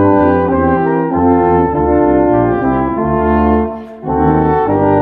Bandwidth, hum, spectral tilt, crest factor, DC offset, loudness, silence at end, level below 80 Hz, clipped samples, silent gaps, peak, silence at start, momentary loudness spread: 4.5 kHz; none; -11.5 dB/octave; 12 dB; under 0.1%; -12 LUFS; 0 s; -28 dBFS; under 0.1%; none; 0 dBFS; 0 s; 4 LU